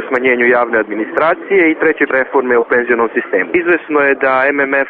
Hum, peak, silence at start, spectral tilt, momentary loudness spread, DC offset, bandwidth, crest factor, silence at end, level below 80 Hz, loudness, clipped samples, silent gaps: none; 0 dBFS; 0 s; -3 dB/octave; 4 LU; under 0.1%; 4.5 kHz; 12 dB; 0 s; -56 dBFS; -13 LUFS; under 0.1%; none